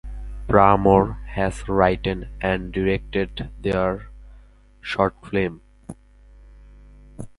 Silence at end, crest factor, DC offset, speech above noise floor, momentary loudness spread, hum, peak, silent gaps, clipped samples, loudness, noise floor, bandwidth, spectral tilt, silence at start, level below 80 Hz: 0.1 s; 22 dB; under 0.1%; 28 dB; 21 LU; 50 Hz at -40 dBFS; 0 dBFS; none; under 0.1%; -21 LUFS; -49 dBFS; 11.5 kHz; -7.5 dB/octave; 0.05 s; -36 dBFS